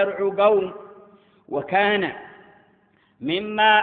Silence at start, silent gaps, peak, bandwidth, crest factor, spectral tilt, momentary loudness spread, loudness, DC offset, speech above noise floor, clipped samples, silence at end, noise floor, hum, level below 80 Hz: 0 s; none; -4 dBFS; 4.6 kHz; 20 dB; -9 dB/octave; 15 LU; -22 LUFS; under 0.1%; 40 dB; under 0.1%; 0 s; -60 dBFS; none; -64 dBFS